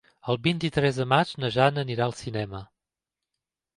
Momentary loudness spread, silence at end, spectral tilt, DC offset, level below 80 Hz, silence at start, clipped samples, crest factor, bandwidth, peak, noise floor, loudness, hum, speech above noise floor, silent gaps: 10 LU; 1.1 s; -6 dB/octave; under 0.1%; -56 dBFS; 0.25 s; under 0.1%; 22 dB; 11.5 kHz; -6 dBFS; -88 dBFS; -25 LUFS; none; 63 dB; none